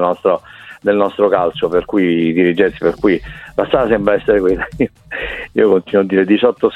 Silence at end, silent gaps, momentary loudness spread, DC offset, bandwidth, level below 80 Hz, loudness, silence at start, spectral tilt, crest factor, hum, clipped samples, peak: 0 s; none; 8 LU; under 0.1%; 5.8 kHz; -40 dBFS; -15 LUFS; 0 s; -8 dB/octave; 14 dB; none; under 0.1%; 0 dBFS